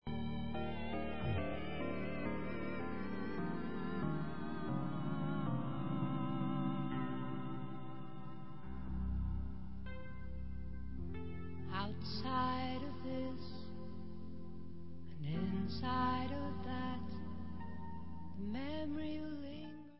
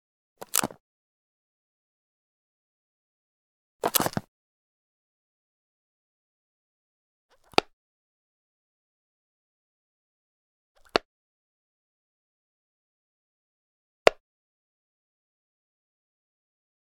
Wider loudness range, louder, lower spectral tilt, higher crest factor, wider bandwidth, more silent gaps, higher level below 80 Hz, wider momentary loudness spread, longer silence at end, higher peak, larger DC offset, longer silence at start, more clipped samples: about the same, 5 LU vs 5 LU; second, -43 LUFS vs -27 LUFS; first, -6 dB/octave vs -2 dB/octave; second, 18 dB vs 36 dB; second, 5.6 kHz vs 19 kHz; second, none vs 0.80-3.79 s, 4.28-7.29 s, 7.73-10.75 s, 11.05-14.06 s; first, -52 dBFS vs -64 dBFS; first, 11 LU vs 8 LU; second, 0 s vs 2.7 s; second, -22 dBFS vs 0 dBFS; first, 0.6% vs under 0.1%; second, 0 s vs 0.55 s; neither